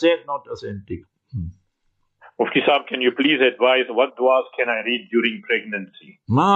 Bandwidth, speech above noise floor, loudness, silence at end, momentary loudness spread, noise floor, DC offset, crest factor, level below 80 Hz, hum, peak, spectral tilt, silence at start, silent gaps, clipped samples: 8 kHz; 49 dB; -20 LUFS; 0 s; 16 LU; -69 dBFS; under 0.1%; 16 dB; -54 dBFS; none; -4 dBFS; -6.5 dB/octave; 0 s; none; under 0.1%